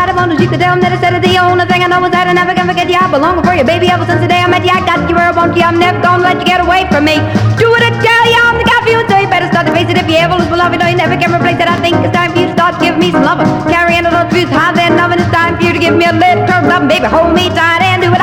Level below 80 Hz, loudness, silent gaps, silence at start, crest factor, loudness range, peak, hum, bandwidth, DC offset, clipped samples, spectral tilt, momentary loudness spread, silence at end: -34 dBFS; -9 LUFS; none; 0 s; 8 dB; 2 LU; 0 dBFS; none; 18 kHz; under 0.1%; 0.2%; -5.5 dB/octave; 3 LU; 0 s